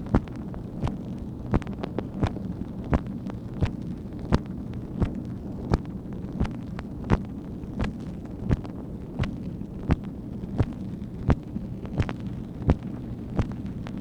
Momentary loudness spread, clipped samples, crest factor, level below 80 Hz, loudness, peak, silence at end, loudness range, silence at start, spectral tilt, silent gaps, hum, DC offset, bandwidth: 8 LU; under 0.1%; 28 dB; -36 dBFS; -31 LUFS; -2 dBFS; 0 s; 1 LU; 0 s; -8.5 dB/octave; none; none; under 0.1%; 10 kHz